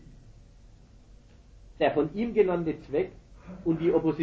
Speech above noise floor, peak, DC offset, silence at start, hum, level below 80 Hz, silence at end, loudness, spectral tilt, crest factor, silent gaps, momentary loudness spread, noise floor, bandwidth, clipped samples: 26 dB; -10 dBFS; under 0.1%; 0.1 s; none; -52 dBFS; 0 s; -28 LUFS; -8.5 dB/octave; 18 dB; none; 9 LU; -53 dBFS; 7.2 kHz; under 0.1%